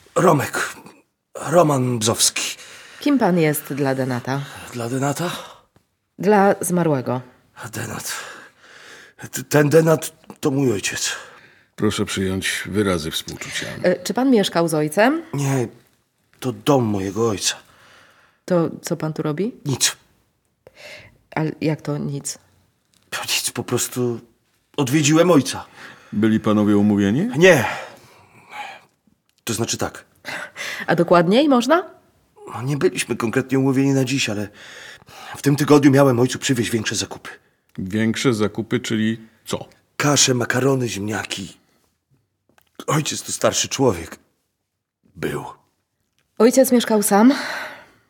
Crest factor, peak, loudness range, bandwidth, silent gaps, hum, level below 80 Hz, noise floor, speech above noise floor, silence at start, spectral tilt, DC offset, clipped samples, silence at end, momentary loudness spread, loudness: 20 dB; -2 dBFS; 6 LU; 19 kHz; none; none; -58 dBFS; -77 dBFS; 58 dB; 0.15 s; -4.5 dB/octave; under 0.1%; under 0.1%; 0.3 s; 18 LU; -19 LUFS